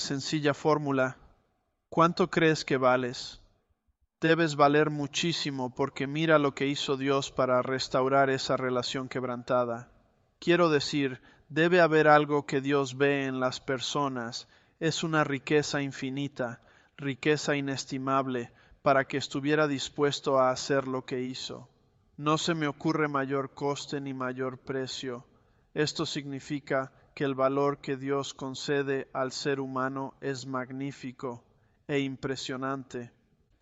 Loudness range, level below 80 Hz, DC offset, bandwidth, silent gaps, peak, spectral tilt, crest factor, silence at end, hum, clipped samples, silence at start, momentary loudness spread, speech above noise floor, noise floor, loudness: 8 LU; -66 dBFS; under 0.1%; 8.2 kHz; none; -6 dBFS; -5 dB/octave; 22 dB; 0.55 s; none; under 0.1%; 0 s; 12 LU; 47 dB; -75 dBFS; -29 LUFS